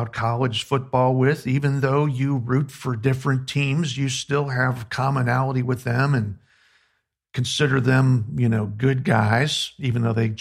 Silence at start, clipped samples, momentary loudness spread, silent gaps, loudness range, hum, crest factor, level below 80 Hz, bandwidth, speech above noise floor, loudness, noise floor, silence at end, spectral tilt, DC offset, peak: 0 s; under 0.1%; 6 LU; none; 2 LU; none; 18 dB; -54 dBFS; 12.5 kHz; 50 dB; -22 LUFS; -71 dBFS; 0 s; -6 dB/octave; under 0.1%; -4 dBFS